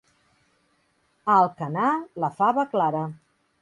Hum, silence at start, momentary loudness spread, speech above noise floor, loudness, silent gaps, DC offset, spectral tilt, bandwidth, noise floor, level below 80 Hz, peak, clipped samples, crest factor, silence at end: none; 1.25 s; 11 LU; 45 dB; -24 LUFS; none; under 0.1%; -8 dB/octave; 11 kHz; -68 dBFS; -72 dBFS; -8 dBFS; under 0.1%; 18 dB; 0.45 s